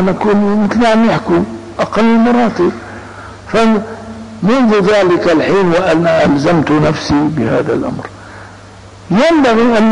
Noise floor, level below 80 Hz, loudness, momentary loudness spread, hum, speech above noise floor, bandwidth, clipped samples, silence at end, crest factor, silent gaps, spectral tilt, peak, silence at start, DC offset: -34 dBFS; -40 dBFS; -11 LUFS; 18 LU; none; 24 dB; 10 kHz; under 0.1%; 0 s; 6 dB; none; -6.5 dB/octave; -4 dBFS; 0 s; under 0.1%